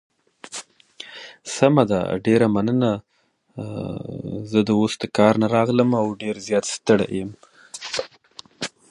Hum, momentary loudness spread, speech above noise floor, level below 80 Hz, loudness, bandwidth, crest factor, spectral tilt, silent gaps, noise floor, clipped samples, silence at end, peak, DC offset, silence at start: none; 18 LU; 27 dB; -56 dBFS; -21 LUFS; 11.5 kHz; 22 dB; -5.5 dB/octave; none; -47 dBFS; under 0.1%; 0.25 s; 0 dBFS; under 0.1%; 0.45 s